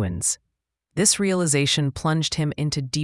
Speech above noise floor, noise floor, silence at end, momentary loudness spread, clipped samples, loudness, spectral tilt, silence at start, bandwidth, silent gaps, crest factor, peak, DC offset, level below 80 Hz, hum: 56 dB; -78 dBFS; 0 s; 7 LU; under 0.1%; -22 LUFS; -3.5 dB/octave; 0 s; 12 kHz; none; 20 dB; -2 dBFS; under 0.1%; -50 dBFS; none